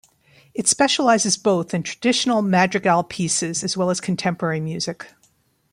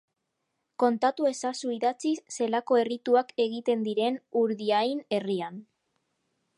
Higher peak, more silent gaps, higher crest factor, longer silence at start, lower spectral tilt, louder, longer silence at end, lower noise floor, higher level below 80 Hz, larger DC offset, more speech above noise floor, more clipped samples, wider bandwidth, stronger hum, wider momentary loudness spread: first, 0 dBFS vs -10 dBFS; neither; about the same, 20 dB vs 18 dB; second, 0.55 s vs 0.8 s; about the same, -3.5 dB/octave vs -4.5 dB/octave; first, -20 LUFS vs -28 LUFS; second, 0.65 s vs 0.95 s; second, -62 dBFS vs -80 dBFS; first, -62 dBFS vs -84 dBFS; neither; second, 42 dB vs 53 dB; neither; first, 15 kHz vs 11.5 kHz; neither; about the same, 9 LU vs 7 LU